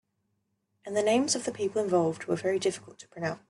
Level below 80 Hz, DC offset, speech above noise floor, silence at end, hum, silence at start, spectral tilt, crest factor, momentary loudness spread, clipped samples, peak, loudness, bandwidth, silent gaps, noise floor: -72 dBFS; under 0.1%; 49 dB; 0.1 s; none; 0.85 s; -4 dB/octave; 16 dB; 13 LU; under 0.1%; -14 dBFS; -29 LUFS; 12 kHz; none; -78 dBFS